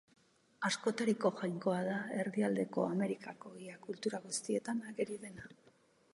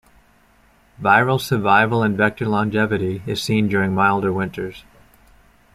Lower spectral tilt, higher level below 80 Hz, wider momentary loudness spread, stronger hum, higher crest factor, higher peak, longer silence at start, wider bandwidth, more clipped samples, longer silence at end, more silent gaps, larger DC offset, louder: about the same, -5 dB/octave vs -6 dB/octave; second, -82 dBFS vs -52 dBFS; first, 15 LU vs 9 LU; neither; about the same, 20 dB vs 18 dB; second, -18 dBFS vs -2 dBFS; second, 0.6 s vs 1 s; second, 11.5 kHz vs 15 kHz; neither; second, 0.6 s vs 0.95 s; neither; neither; second, -37 LUFS vs -18 LUFS